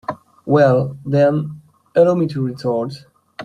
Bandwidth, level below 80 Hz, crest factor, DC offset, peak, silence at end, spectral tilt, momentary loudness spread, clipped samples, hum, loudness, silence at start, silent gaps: 11 kHz; -56 dBFS; 16 dB; under 0.1%; -2 dBFS; 0 s; -8.5 dB/octave; 16 LU; under 0.1%; none; -17 LUFS; 0.1 s; none